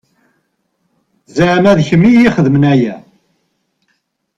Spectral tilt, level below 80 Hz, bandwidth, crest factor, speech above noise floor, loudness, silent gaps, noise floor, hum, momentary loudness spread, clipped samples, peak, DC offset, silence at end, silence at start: -7.5 dB/octave; -44 dBFS; 7.8 kHz; 12 dB; 56 dB; -10 LUFS; none; -65 dBFS; none; 12 LU; under 0.1%; 0 dBFS; under 0.1%; 1.4 s; 1.35 s